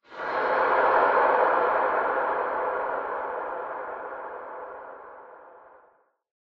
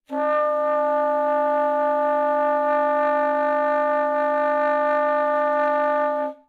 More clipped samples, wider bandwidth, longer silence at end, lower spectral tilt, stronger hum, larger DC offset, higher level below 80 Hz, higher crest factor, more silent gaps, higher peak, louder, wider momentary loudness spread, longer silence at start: neither; first, 5.8 kHz vs 4.7 kHz; first, 0.85 s vs 0.15 s; first, -6 dB/octave vs -4.5 dB/octave; neither; neither; first, -66 dBFS vs under -90 dBFS; first, 18 dB vs 12 dB; neither; about the same, -8 dBFS vs -10 dBFS; second, -25 LUFS vs -21 LUFS; first, 19 LU vs 1 LU; about the same, 0.1 s vs 0.1 s